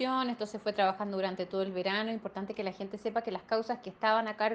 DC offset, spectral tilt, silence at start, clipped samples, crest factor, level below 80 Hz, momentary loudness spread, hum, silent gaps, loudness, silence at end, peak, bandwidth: under 0.1%; -5.5 dB/octave; 0 s; under 0.1%; 18 dB; -74 dBFS; 9 LU; none; none; -33 LUFS; 0 s; -14 dBFS; 9 kHz